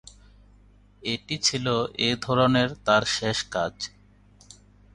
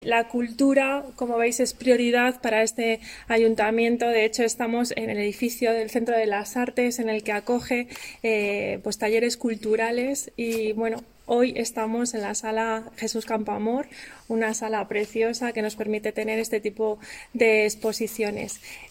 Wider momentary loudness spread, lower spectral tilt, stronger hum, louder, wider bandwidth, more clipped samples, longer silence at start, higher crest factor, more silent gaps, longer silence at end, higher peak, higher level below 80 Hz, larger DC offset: first, 10 LU vs 7 LU; about the same, -4 dB/octave vs -3.5 dB/octave; first, 50 Hz at -50 dBFS vs none; about the same, -24 LUFS vs -25 LUFS; second, 11.5 kHz vs 16.5 kHz; neither; first, 1.05 s vs 0 s; about the same, 22 dB vs 18 dB; neither; first, 1.05 s vs 0.05 s; about the same, -6 dBFS vs -6 dBFS; about the same, -54 dBFS vs -58 dBFS; neither